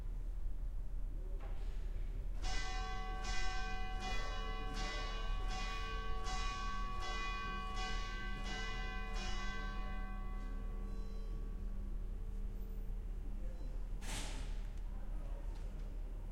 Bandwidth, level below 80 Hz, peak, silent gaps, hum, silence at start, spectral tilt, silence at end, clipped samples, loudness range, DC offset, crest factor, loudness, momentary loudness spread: 11 kHz; -42 dBFS; -24 dBFS; none; none; 0 s; -4 dB/octave; 0 s; under 0.1%; 5 LU; under 0.1%; 16 dB; -45 LUFS; 6 LU